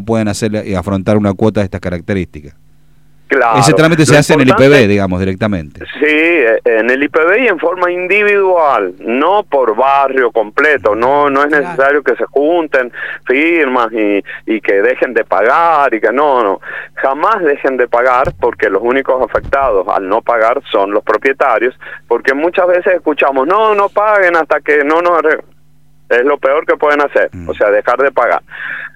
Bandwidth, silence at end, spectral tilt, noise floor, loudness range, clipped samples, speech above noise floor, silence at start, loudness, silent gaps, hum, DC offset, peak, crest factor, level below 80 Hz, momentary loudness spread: 15 kHz; 0.05 s; -5.5 dB/octave; -50 dBFS; 3 LU; 0.1%; 39 dB; 0 s; -11 LUFS; none; none; 0.8%; 0 dBFS; 12 dB; -44 dBFS; 8 LU